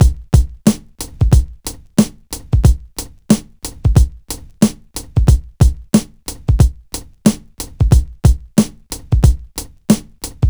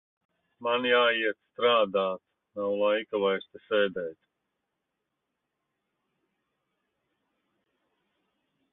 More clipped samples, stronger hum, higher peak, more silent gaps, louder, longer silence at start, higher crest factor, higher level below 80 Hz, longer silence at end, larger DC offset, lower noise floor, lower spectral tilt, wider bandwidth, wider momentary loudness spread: neither; neither; first, 0 dBFS vs -12 dBFS; neither; first, -16 LUFS vs -27 LUFS; second, 0 s vs 0.6 s; second, 14 dB vs 20 dB; first, -18 dBFS vs -78 dBFS; second, 0 s vs 4.6 s; neither; second, -31 dBFS vs -83 dBFS; about the same, -6.5 dB/octave vs -7.5 dB/octave; first, over 20 kHz vs 4.1 kHz; about the same, 15 LU vs 13 LU